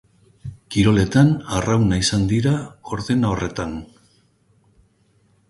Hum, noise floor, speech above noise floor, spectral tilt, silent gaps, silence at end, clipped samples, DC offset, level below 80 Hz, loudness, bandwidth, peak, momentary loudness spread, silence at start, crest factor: none; -60 dBFS; 42 dB; -6 dB/octave; none; 1.65 s; under 0.1%; under 0.1%; -40 dBFS; -19 LUFS; 11.5 kHz; -4 dBFS; 16 LU; 0.45 s; 18 dB